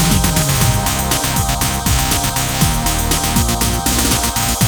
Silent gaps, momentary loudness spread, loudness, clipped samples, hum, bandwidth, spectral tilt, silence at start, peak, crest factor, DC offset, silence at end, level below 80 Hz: none; 2 LU; -15 LUFS; under 0.1%; none; over 20 kHz; -3.5 dB/octave; 0 s; -2 dBFS; 14 dB; under 0.1%; 0 s; -22 dBFS